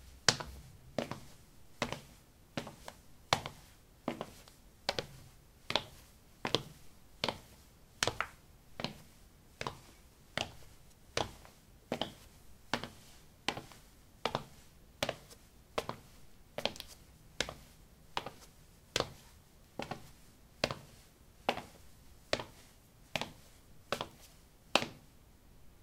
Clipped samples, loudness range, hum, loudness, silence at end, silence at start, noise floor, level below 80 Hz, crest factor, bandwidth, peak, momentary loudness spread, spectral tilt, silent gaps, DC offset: under 0.1%; 3 LU; none; -40 LUFS; 0 s; 0 s; -61 dBFS; -62 dBFS; 42 dB; 17 kHz; -2 dBFS; 25 LU; -2.5 dB/octave; none; under 0.1%